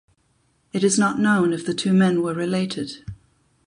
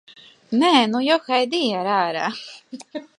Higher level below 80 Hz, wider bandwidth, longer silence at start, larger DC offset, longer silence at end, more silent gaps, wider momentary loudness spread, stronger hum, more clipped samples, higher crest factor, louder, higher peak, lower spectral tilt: first, -56 dBFS vs -74 dBFS; about the same, 11 kHz vs 11 kHz; first, 0.75 s vs 0.5 s; neither; first, 0.5 s vs 0.15 s; neither; second, 13 LU vs 19 LU; neither; neither; about the same, 16 dB vs 20 dB; about the same, -21 LUFS vs -20 LUFS; second, -6 dBFS vs -2 dBFS; about the same, -5 dB/octave vs -4 dB/octave